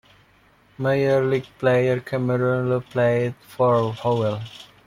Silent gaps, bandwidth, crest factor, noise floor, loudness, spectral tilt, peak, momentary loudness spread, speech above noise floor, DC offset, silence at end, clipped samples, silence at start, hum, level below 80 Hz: none; 15 kHz; 16 dB; -57 dBFS; -22 LUFS; -8 dB/octave; -6 dBFS; 7 LU; 35 dB; under 0.1%; 0.2 s; under 0.1%; 0.8 s; none; -58 dBFS